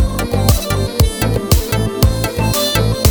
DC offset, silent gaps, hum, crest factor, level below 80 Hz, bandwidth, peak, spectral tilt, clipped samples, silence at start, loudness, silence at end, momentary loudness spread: under 0.1%; none; none; 14 dB; -20 dBFS; over 20 kHz; 0 dBFS; -5 dB/octave; under 0.1%; 0 s; -15 LUFS; 0 s; 3 LU